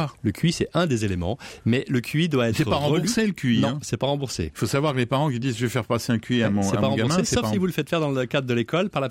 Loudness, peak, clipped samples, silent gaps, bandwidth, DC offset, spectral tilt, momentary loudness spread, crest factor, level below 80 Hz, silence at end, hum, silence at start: -23 LUFS; -10 dBFS; under 0.1%; none; 16 kHz; under 0.1%; -5.5 dB/octave; 4 LU; 12 dB; -48 dBFS; 0 s; none; 0 s